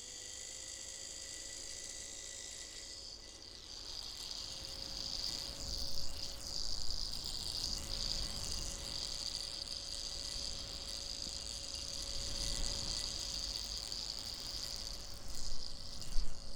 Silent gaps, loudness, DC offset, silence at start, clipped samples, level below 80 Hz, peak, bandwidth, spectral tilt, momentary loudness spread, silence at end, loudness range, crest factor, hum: none; -41 LUFS; under 0.1%; 0 s; under 0.1%; -48 dBFS; -18 dBFS; 18.5 kHz; -1 dB/octave; 7 LU; 0 s; 6 LU; 22 dB; none